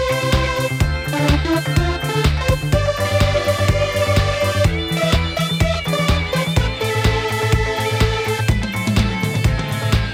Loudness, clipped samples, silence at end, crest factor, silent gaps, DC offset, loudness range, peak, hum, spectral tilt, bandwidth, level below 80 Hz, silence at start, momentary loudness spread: -18 LUFS; under 0.1%; 0 s; 16 dB; none; under 0.1%; 1 LU; -2 dBFS; none; -5.5 dB/octave; 16.5 kHz; -24 dBFS; 0 s; 2 LU